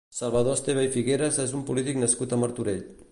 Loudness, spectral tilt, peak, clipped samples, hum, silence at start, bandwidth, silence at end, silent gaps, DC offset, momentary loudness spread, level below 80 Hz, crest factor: -26 LUFS; -4.5 dB/octave; -10 dBFS; under 0.1%; none; 0.1 s; 11.5 kHz; 0.1 s; none; under 0.1%; 5 LU; -56 dBFS; 16 dB